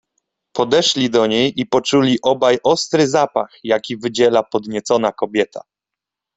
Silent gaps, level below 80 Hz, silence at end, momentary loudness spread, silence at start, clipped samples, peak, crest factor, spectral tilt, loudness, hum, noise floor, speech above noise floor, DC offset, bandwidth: none; -58 dBFS; 0.8 s; 8 LU; 0.55 s; under 0.1%; -2 dBFS; 16 dB; -4 dB/octave; -17 LUFS; none; -85 dBFS; 68 dB; under 0.1%; 8.4 kHz